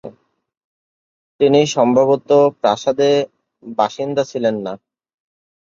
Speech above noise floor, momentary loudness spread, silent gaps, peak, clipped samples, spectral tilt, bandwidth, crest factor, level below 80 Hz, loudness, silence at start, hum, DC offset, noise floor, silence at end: 32 dB; 13 LU; 0.57-1.39 s; -2 dBFS; under 0.1%; -5.5 dB/octave; 7.6 kHz; 16 dB; -64 dBFS; -16 LUFS; 0.05 s; none; under 0.1%; -47 dBFS; 1 s